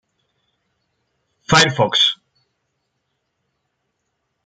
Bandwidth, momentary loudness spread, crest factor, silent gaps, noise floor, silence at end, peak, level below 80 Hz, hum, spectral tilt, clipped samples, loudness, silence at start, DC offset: 9.4 kHz; 5 LU; 22 dB; none; -73 dBFS; 2.3 s; 0 dBFS; -54 dBFS; none; -3 dB/octave; under 0.1%; -14 LUFS; 1.5 s; under 0.1%